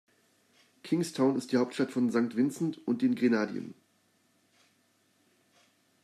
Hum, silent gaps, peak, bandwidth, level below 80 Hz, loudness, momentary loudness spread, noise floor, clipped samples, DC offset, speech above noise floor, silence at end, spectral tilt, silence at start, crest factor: none; none; -14 dBFS; 13 kHz; -82 dBFS; -30 LUFS; 8 LU; -70 dBFS; under 0.1%; under 0.1%; 41 dB; 2.3 s; -6 dB/octave; 0.85 s; 18 dB